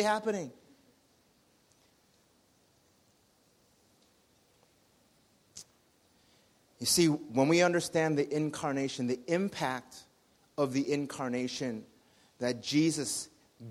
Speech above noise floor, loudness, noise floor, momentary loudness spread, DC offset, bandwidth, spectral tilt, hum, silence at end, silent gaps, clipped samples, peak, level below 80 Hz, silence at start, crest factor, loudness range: 38 dB; -31 LUFS; -68 dBFS; 21 LU; under 0.1%; 15.5 kHz; -4 dB/octave; none; 0 s; none; under 0.1%; -12 dBFS; -72 dBFS; 0 s; 22 dB; 6 LU